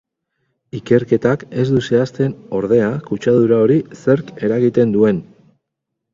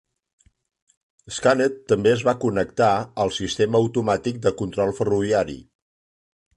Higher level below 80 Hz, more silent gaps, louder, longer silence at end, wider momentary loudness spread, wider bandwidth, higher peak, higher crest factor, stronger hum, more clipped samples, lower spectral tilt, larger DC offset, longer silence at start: about the same, -52 dBFS vs -52 dBFS; neither; first, -16 LUFS vs -22 LUFS; about the same, 0.9 s vs 0.95 s; about the same, 7 LU vs 5 LU; second, 7.6 kHz vs 11 kHz; first, 0 dBFS vs -4 dBFS; about the same, 16 dB vs 18 dB; neither; neither; first, -8 dB/octave vs -5.5 dB/octave; neither; second, 0.75 s vs 1.25 s